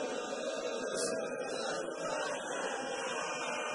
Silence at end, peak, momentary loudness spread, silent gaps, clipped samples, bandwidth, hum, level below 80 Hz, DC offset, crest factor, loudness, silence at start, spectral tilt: 0 s; -22 dBFS; 3 LU; none; under 0.1%; 11 kHz; none; -78 dBFS; under 0.1%; 14 dB; -37 LUFS; 0 s; -2 dB/octave